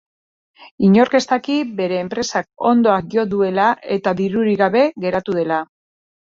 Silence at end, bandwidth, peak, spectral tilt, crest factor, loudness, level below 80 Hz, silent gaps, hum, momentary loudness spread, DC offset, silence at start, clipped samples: 0.6 s; 7.6 kHz; -2 dBFS; -6 dB/octave; 16 dB; -17 LUFS; -56 dBFS; 0.71-0.78 s; none; 7 LU; under 0.1%; 0.6 s; under 0.1%